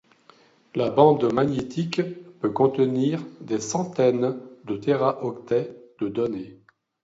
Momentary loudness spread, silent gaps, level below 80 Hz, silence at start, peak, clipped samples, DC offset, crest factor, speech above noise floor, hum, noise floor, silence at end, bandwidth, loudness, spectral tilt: 14 LU; none; -62 dBFS; 0.75 s; -2 dBFS; under 0.1%; under 0.1%; 22 dB; 33 dB; none; -56 dBFS; 0.5 s; 8 kHz; -24 LUFS; -6.5 dB/octave